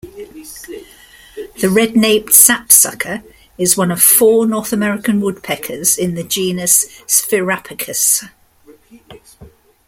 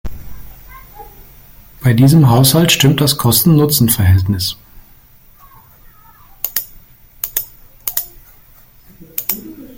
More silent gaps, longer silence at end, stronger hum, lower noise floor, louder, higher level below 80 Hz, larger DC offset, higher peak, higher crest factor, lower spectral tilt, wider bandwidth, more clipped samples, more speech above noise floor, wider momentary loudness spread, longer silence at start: neither; first, 0.4 s vs 0.05 s; neither; about the same, -46 dBFS vs -44 dBFS; about the same, -12 LUFS vs -13 LUFS; second, -52 dBFS vs -40 dBFS; neither; about the same, 0 dBFS vs 0 dBFS; about the same, 16 dB vs 16 dB; second, -2.5 dB/octave vs -5 dB/octave; first, over 20 kHz vs 17 kHz; first, 0.2% vs under 0.1%; about the same, 32 dB vs 34 dB; first, 24 LU vs 19 LU; about the same, 0.05 s vs 0.05 s